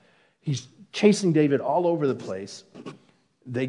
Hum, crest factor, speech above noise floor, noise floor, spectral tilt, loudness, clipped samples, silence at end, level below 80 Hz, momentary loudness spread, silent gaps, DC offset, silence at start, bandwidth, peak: none; 20 dB; 31 dB; -55 dBFS; -6 dB/octave; -24 LUFS; under 0.1%; 0 s; -76 dBFS; 21 LU; none; under 0.1%; 0.45 s; 11 kHz; -6 dBFS